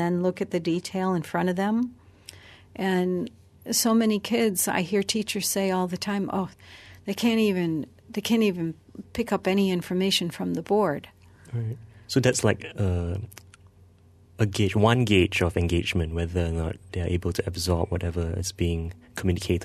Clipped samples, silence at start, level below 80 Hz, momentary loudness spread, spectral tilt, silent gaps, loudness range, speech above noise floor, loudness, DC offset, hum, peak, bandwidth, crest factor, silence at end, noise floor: under 0.1%; 0 s; -44 dBFS; 13 LU; -5 dB/octave; none; 3 LU; 30 dB; -26 LUFS; under 0.1%; none; -4 dBFS; 13.5 kHz; 22 dB; 0 s; -55 dBFS